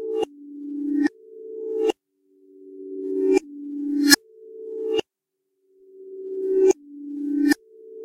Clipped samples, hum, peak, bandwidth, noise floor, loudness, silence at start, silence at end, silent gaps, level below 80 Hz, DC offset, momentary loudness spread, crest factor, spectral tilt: under 0.1%; none; 0 dBFS; 16 kHz; -80 dBFS; -23 LUFS; 0 s; 0 s; none; -66 dBFS; under 0.1%; 20 LU; 26 dB; -1.5 dB/octave